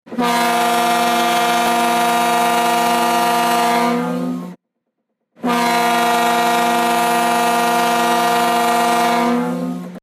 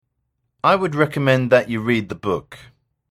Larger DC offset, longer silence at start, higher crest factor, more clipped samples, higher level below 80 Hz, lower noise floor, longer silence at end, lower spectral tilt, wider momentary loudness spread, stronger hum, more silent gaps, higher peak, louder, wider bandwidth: neither; second, 0.05 s vs 0.65 s; second, 10 dB vs 20 dB; neither; second, -62 dBFS vs -54 dBFS; about the same, -74 dBFS vs -73 dBFS; second, 0.05 s vs 0.55 s; second, -3 dB/octave vs -7 dB/octave; second, 5 LU vs 9 LU; neither; neither; second, -6 dBFS vs -2 dBFS; first, -16 LUFS vs -19 LUFS; about the same, 15.5 kHz vs 14.5 kHz